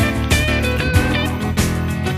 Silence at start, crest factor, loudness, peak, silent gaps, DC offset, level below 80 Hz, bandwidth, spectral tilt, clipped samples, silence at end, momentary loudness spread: 0 s; 16 dB; -18 LUFS; -2 dBFS; none; under 0.1%; -24 dBFS; 15 kHz; -5 dB/octave; under 0.1%; 0 s; 3 LU